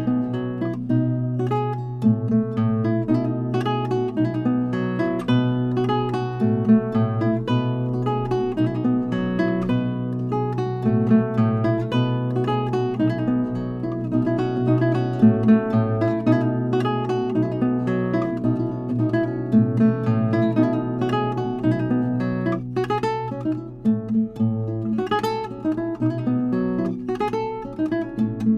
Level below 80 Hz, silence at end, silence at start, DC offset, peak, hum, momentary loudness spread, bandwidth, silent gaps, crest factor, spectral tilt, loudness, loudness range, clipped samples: -48 dBFS; 0 s; 0 s; under 0.1%; -4 dBFS; none; 7 LU; 7.2 kHz; none; 18 dB; -9 dB/octave; -22 LUFS; 4 LU; under 0.1%